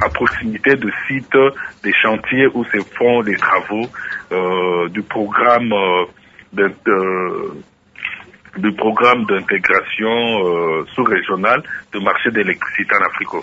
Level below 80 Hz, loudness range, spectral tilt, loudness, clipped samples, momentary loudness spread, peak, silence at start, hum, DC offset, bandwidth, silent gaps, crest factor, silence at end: -48 dBFS; 2 LU; -6.5 dB/octave; -16 LUFS; under 0.1%; 10 LU; 0 dBFS; 0 s; none; under 0.1%; 7.8 kHz; none; 16 dB; 0 s